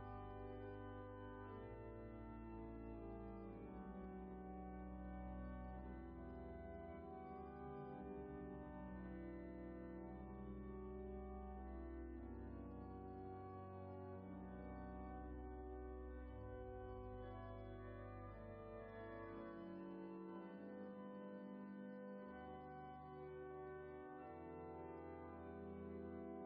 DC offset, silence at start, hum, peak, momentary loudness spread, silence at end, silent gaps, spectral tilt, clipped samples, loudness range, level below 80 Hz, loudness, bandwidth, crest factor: under 0.1%; 0 s; none; -42 dBFS; 2 LU; 0 s; none; -8 dB/octave; under 0.1%; 1 LU; -60 dBFS; -55 LUFS; 4.8 kHz; 10 dB